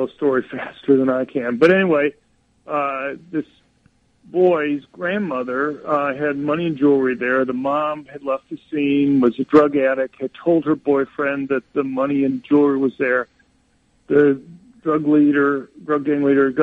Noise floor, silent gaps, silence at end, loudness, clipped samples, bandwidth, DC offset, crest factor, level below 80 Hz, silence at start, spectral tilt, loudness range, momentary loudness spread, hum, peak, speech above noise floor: -60 dBFS; none; 0 s; -19 LUFS; under 0.1%; 5.6 kHz; under 0.1%; 18 dB; -62 dBFS; 0 s; -8.5 dB/octave; 4 LU; 11 LU; none; -2 dBFS; 42 dB